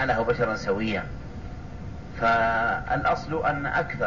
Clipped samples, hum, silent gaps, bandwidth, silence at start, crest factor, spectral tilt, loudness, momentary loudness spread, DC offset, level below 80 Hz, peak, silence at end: under 0.1%; none; none; 7.4 kHz; 0 s; 14 dB; -6.5 dB/octave; -25 LUFS; 17 LU; 0.6%; -42 dBFS; -12 dBFS; 0 s